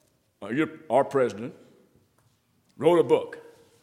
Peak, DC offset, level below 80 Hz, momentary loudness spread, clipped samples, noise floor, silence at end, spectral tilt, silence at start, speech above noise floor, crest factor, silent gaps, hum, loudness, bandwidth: -6 dBFS; under 0.1%; -78 dBFS; 19 LU; under 0.1%; -67 dBFS; 0.4 s; -6.5 dB/octave; 0.4 s; 42 dB; 20 dB; none; none; -25 LUFS; 13 kHz